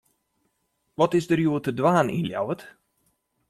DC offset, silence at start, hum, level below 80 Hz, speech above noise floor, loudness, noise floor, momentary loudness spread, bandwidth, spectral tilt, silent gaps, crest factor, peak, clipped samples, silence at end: under 0.1%; 1 s; none; -62 dBFS; 51 dB; -24 LUFS; -74 dBFS; 10 LU; 14 kHz; -7 dB/octave; none; 20 dB; -6 dBFS; under 0.1%; 0.8 s